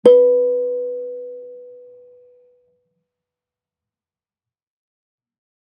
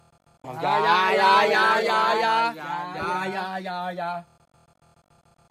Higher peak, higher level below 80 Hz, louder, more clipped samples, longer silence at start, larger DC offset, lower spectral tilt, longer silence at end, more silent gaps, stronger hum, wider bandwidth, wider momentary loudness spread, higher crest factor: first, -2 dBFS vs -6 dBFS; second, -72 dBFS vs -66 dBFS; first, -17 LUFS vs -22 LUFS; neither; second, 0.05 s vs 0.45 s; neither; first, -6.5 dB/octave vs -3.5 dB/octave; first, 3.95 s vs 1.3 s; neither; neither; second, 9 kHz vs 15.5 kHz; first, 25 LU vs 14 LU; about the same, 20 dB vs 18 dB